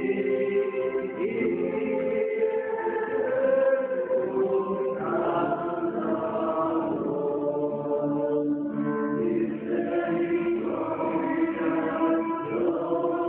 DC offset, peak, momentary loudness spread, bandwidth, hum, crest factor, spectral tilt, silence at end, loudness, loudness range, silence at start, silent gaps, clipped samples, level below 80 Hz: under 0.1%; -12 dBFS; 3 LU; 3.8 kHz; none; 14 dB; -6.5 dB/octave; 0 s; -27 LUFS; 1 LU; 0 s; none; under 0.1%; -66 dBFS